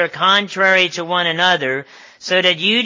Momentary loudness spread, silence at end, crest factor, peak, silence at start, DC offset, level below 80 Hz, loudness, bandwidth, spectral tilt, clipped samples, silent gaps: 8 LU; 0 s; 16 dB; -2 dBFS; 0 s; under 0.1%; -70 dBFS; -15 LUFS; 7.6 kHz; -3 dB/octave; under 0.1%; none